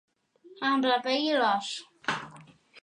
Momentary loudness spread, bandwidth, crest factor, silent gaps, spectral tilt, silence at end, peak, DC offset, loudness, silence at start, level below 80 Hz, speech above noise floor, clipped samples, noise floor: 11 LU; 10.5 kHz; 18 dB; none; -3.5 dB/octave; 0.05 s; -12 dBFS; under 0.1%; -28 LUFS; 0.45 s; -76 dBFS; 29 dB; under 0.1%; -56 dBFS